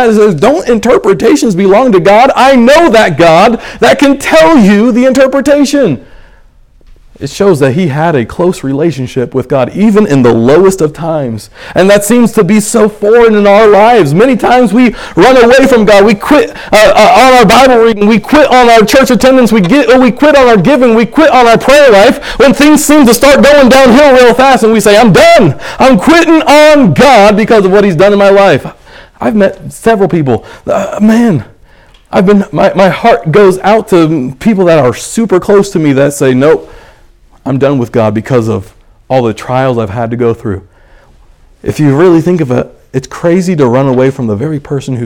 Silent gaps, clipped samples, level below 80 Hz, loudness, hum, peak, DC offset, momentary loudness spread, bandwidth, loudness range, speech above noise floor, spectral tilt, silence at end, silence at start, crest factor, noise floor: none; 7%; -32 dBFS; -5 LUFS; none; 0 dBFS; under 0.1%; 10 LU; 18.5 kHz; 8 LU; 35 dB; -5.5 dB/octave; 0 s; 0 s; 6 dB; -40 dBFS